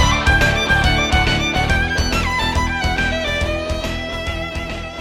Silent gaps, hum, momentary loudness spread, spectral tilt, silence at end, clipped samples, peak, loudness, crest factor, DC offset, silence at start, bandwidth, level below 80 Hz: none; none; 9 LU; -4 dB/octave; 0 s; under 0.1%; -4 dBFS; -18 LUFS; 14 dB; under 0.1%; 0 s; 16 kHz; -24 dBFS